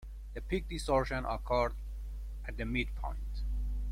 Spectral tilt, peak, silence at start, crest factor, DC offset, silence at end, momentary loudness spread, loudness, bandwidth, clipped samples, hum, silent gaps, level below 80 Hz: -6 dB/octave; -16 dBFS; 0 s; 18 dB; under 0.1%; 0 s; 13 LU; -36 LUFS; 13 kHz; under 0.1%; none; none; -38 dBFS